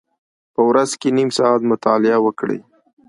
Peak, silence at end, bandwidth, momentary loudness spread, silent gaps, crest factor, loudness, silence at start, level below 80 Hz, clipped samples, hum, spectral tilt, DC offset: 0 dBFS; 0.5 s; 11.5 kHz; 10 LU; none; 16 dB; -17 LUFS; 0.6 s; -66 dBFS; under 0.1%; none; -5 dB/octave; under 0.1%